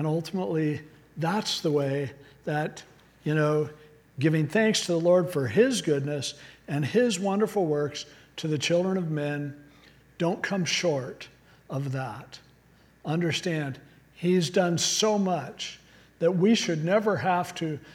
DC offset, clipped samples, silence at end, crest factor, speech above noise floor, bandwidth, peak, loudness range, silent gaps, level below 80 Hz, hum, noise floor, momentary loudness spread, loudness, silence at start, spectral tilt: under 0.1%; under 0.1%; 0 s; 18 dB; 32 dB; 16.5 kHz; -8 dBFS; 6 LU; none; -66 dBFS; none; -59 dBFS; 14 LU; -27 LUFS; 0 s; -5 dB/octave